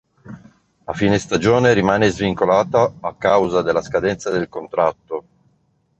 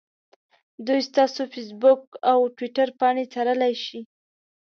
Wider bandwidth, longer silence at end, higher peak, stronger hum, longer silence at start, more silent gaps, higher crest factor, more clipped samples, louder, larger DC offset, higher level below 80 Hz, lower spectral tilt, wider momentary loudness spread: first, 8.4 kHz vs 6.6 kHz; first, 0.8 s vs 0.65 s; first, 0 dBFS vs -6 dBFS; neither; second, 0.25 s vs 0.8 s; second, none vs 2.07-2.12 s; about the same, 18 dB vs 18 dB; neither; first, -18 LUFS vs -23 LUFS; neither; first, -46 dBFS vs -80 dBFS; first, -6 dB/octave vs -4 dB/octave; about the same, 12 LU vs 12 LU